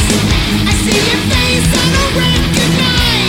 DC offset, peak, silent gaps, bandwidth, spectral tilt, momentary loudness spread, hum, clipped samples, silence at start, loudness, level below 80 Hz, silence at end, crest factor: under 0.1%; 0 dBFS; none; 17 kHz; -4 dB/octave; 2 LU; none; under 0.1%; 0 s; -11 LUFS; -20 dBFS; 0 s; 12 dB